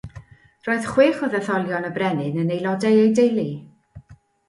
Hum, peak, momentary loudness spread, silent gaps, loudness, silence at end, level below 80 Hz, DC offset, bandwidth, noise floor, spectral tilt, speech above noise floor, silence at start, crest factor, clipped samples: none; -4 dBFS; 12 LU; none; -20 LUFS; 0.35 s; -56 dBFS; under 0.1%; 11.5 kHz; -49 dBFS; -6.5 dB/octave; 29 dB; 0.05 s; 16 dB; under 0.1%